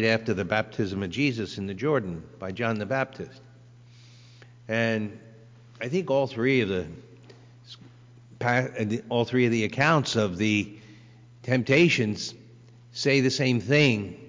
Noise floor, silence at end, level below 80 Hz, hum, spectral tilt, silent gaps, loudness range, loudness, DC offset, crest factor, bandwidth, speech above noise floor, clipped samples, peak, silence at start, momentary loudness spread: -51 dBFS; 0 s; -56 dBFS; 60 Hz at -55 dBFS; -5.5 dB/octave; none; 7 LU; -25 LUFS; under 0.1%; 18 dB; 7.6 kHz; 26 dB; under 0.1%; -10 dBFS; 0 s; 16 LU